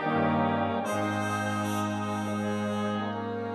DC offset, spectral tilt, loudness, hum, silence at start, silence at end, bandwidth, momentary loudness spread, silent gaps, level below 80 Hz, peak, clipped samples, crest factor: under 0.1%; -6 dB/octave; -29 LUFS; none; 0 s; 0 s; 13.5 kHz; 5 LU; none; -76 dBFS; -16 dBFS; under 0.1%; 14 dB